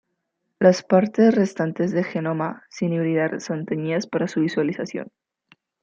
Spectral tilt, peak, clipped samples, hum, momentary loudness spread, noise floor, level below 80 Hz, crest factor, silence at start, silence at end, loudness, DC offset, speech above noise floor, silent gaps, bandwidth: -7 dB/octave; -4 dBFS; under 0.1%; none; 11 LU; -76 dBFS; -70 dBFS; 20 dB; 0.6 s; 0.75 s; -22 LUFS; under 0.1%; 55 dB; none; 7.6 kHz